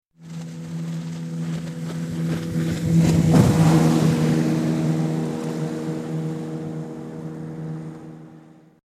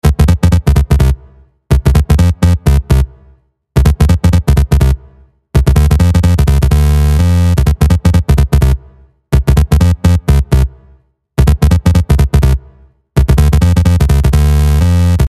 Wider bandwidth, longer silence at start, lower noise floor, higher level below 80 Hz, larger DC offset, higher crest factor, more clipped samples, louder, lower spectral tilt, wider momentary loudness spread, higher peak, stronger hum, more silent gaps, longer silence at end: about the same, 14.5 kHz vs 14 kHz; first, 0.2 s vs 0.05 s; about the same, -47 dBFS vs -47 dBFS; second, -46 dBFS vs -12 dBFS; neither; first, 20 dB vs 10 dB; neither; second, -22 LUFS vs -11 LUFS; about the same, -7 dB/octave vs -7 dB/octave; first, 17 LU vs 5 LU; about the same, -2 dBFS vs 0 dBFS; neither; neither; first, 0.6 s vs 0 s